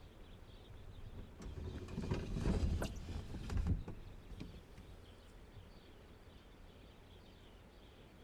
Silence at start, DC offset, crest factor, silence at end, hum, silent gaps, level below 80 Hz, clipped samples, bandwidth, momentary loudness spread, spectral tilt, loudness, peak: 0 s; under 0.1%; 20 dB; 0 s; none; none; -48 dBFS; under 0.1%; 14.5 kHz; 20 LU; -7 dB/octave; -44 LUFS; -26 dBFS